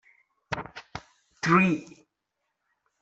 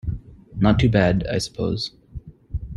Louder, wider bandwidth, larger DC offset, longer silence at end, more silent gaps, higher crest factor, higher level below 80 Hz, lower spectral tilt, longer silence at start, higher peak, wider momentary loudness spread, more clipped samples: second, -26 LUFS vs -21 LUFS; second, 8 kHz vs 12 kHz; neither; first, 1.15 s vs 0 s; neither; about the same, 24 dB vs 20 dB; second, -62 dBFS vs -36 dBFS; about the same, -6 dB/octave vs -6.5 dB/octave; first, 0.5 s vs 0.05 s; second, -8 dBFS vs -2 dBFS; about the same, 21 LU vs 23 LU; neither